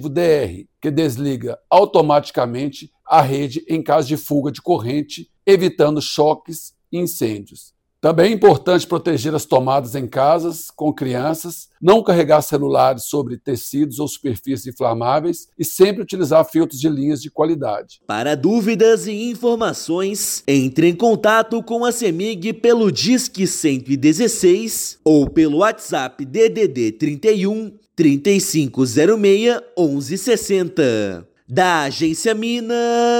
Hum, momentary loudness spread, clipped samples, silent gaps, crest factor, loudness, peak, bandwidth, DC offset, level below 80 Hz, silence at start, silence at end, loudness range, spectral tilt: none; 10 LU; under 0.1%; none; 16 dB; -17 LUFS; -2 dBFS; 17 kHz; under 0.1%; -52 dBFS; 0 s; 0 s; 2 LU; -5 dB/octave